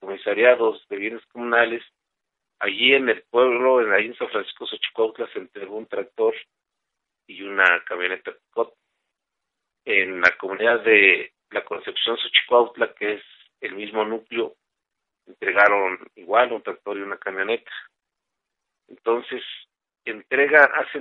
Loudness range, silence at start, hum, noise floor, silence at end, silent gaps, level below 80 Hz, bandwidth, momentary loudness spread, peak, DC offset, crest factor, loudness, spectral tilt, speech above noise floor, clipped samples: 8 LU; 0 s; none; -83 dBFS; 0 s; none; -74 dBFS; 7 kHz; 17 LU; 0 dBFS; under 0.1%; 22 dB; -21 LUFS; -4.5 dB/octave; 61 dB; under 0.1%